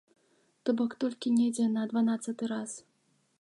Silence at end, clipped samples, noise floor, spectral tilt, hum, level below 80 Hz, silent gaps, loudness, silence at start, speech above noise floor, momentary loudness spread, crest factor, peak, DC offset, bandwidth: 0.6 s; under 0.1%; -70 dBFS; -5 dB/octave; none; -82 dBFS; none; -31 LUFS; 0.65 s; 40 dB; 9 LU; 14 dB; -16 dBFS; under 0.1%; 11.5 kHz